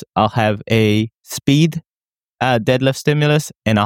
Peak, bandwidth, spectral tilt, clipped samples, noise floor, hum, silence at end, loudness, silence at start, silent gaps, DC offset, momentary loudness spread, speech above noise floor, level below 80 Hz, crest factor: 0 dBFS; 17 kHz; -6 dB/octave; under 0.1%; under -90 dBFS; none; 0 s; -17 LUFS; 0.15 s; 1.88-2.17 s, 2.24-2.34 s; under 0.1%; 6 LU; over 74 dB; -50 dBFS; 16 dB